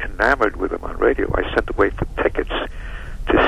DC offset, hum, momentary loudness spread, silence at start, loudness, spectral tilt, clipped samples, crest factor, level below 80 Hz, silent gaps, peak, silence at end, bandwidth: under 0.1%; none; 13 LU; 0 s; -20 LUFS; -6.5 dB/octave; under 0.1%; 16 dB; -28 dBFS; none; -4 dBFS; 0 s; 12 kHz